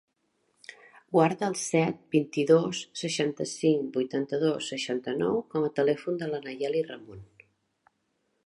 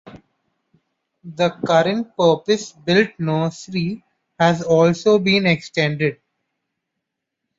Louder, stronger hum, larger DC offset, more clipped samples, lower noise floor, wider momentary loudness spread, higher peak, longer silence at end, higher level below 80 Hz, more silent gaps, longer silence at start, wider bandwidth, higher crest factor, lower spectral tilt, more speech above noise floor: second, -28 LUFS vs -18 LUFS; neither; neither; neither; second, -76 dBFS vs -80 dBFS; about the same, 10 LU vs 9 LU; second, -8 dBFS vs -2 dBFS; second, 1.2 s vs 1.45 s; second, -72 dBFS vs -58 dBFS; neither; first, 0.7 s vs 0.05 s; first, 11.5 kHz vs 7.8 kHz; about the same, 20 dB vs 18 dB; about the same, -5 dB/octave vs -5.5 dB/octave; second, 48 dB vs 62 dB